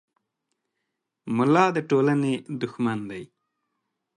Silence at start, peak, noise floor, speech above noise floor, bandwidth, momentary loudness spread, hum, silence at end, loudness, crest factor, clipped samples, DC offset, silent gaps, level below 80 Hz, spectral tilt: 1.25 s; -4 dBFS; -81 dBFS; 58 dB; 11 kHz; 17 LU; none; 0.9 s; -24 LUFS; 22 dB; under 0.1%; under 0.1%; none; -70 dBFS; -7 dB/octave